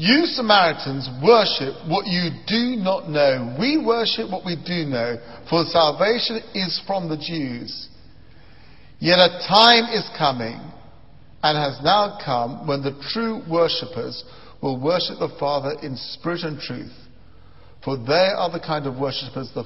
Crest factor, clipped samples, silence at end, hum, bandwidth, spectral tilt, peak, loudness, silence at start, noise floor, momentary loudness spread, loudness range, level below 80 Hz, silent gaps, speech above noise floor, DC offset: 22 dB; under 0.1%; 0 s; none; 8.6 kHz; -6.5 dB/octave; 0 dBFS; -20 LUFS; 0 s; -49 dBFS; 15 LU; 7 LU; -56 dBFS; none; 28 dB; 0.6%